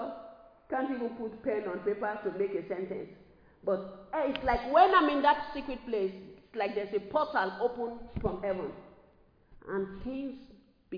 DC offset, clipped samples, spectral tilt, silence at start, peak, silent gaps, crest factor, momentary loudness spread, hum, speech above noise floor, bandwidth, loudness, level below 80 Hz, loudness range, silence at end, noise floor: under 0.1%; under 0.1%; -7.5 dB/octave; 0 s; -10 dBFS; none; 22 dB; 16 LU; none; 32 dB; 5.2 kHz; -32 LUFS; -54 dBFS; 7 LU; 0 s; -63 dBFS